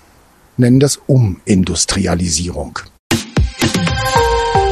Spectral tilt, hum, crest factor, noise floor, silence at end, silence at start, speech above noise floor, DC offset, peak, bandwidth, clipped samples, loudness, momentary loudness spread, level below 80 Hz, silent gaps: -4.5 dB/octave; none; 14 dB; -48 dBFS; 0 s; 0.6 s; 34 dB; under 0.1%; 0 dBFS; 13.5 kHz; under 0.1%; -14 LUFS; 10 LU; -28 dBFS; 2.99-3.10 s